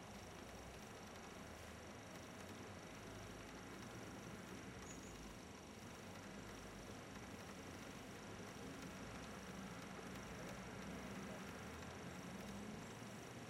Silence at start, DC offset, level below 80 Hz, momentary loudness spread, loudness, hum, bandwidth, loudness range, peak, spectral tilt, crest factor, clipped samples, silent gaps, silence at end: 0 s; under 0.1%; -68 dBFS; 3 LU; -54 LUFS; none; 16 kHz; 3 LU; -40 dBFS; -4.5 dB/octave; 14 dB; under 0.1%; none; 0 s